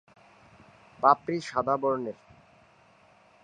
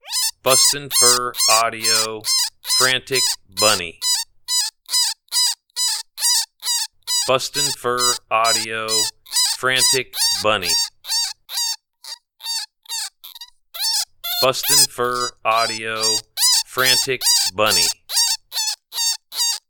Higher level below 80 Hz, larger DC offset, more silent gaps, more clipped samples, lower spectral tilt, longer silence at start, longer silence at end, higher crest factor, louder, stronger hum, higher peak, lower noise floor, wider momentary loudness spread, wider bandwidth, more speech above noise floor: second, -68 dBFS vs -56 dBFS; neither; neither; neither; first, -6 dB/octave vs 0 dB/octave; first, 1 s vs 0.05 s; first, 1.3 s vs 0.1 s; about the same, 24 dB vs 20 dB; second, -27 LUFS vs -17 LUFS; neither; second, -6 dBFS vs 0 dBFS; first, -60 dBFS vs -41 dBFS; first, 13 LU vs 9 LU; second, 9.6 kHz vs 19.5 kHz; first, 33 dB vs 23 dB